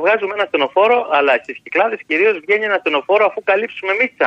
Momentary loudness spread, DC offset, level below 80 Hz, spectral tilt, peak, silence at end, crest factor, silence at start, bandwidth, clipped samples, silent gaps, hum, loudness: 4 LU; under 0.1%; -70 dBFS; -4.5 dB/octave; -2 dBFS; 0 s; 14 dB; 0 s; 7.6 kHz; under 0.1%; none; none; -16 LUFS